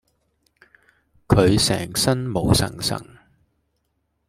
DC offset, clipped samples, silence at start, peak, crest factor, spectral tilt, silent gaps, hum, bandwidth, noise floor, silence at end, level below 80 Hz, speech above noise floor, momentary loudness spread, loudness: under 0.1%; under 0.1%; 1.3 s; -2 dBFS; 20 dB; -4.5 dB/octave; none; none; 16 kHz; -72 dBFS; 1.25 s; -42 dBFS; 52 dB; 9 LU; -20 LUFS